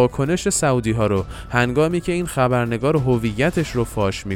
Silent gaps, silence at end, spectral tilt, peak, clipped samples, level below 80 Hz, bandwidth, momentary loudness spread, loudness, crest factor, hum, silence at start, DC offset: none; 0 s; -5.5 dB/octave; -2 dBFS; under 0.1%; -38 dBFS; 16.5 kHz; 4 LU; -20 LUFS; 16 dB; none; 0 s; under 0.1%